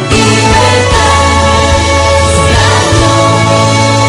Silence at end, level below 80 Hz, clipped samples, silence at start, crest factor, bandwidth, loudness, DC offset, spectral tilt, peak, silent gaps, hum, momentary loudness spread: 0 s; -18 dBFS; 2%; 0 s; 6 dB; 12 kHz; -7 LUFS; under 0.1%; -4 dB/octave; 0 dBFS; none; none; 1 LU